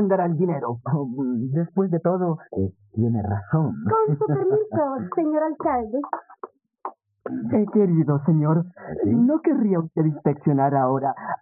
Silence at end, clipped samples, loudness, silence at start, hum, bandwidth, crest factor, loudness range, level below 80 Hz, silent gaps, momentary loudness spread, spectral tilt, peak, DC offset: 0.05 s; under 0.1%; -23 LUFS; 0 s; none; 2.7 kHz; 16 dB; 4 LU; -62 dBFS; none; 12 LU; -13 dB/octave; -6 dBFS; under 0.1%